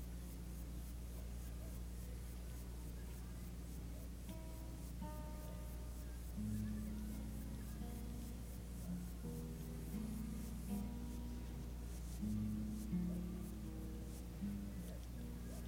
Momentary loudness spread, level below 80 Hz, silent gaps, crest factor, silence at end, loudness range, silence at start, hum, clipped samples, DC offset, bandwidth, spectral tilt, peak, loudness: 7 LU; -50 dBFS; none; 14 dB; 0 s; 5 LU; 0 s; none; under 0.1%; under 0.1%; 17 kHz; -6.5 dB/octave; -32 dBFS; -49 LUFS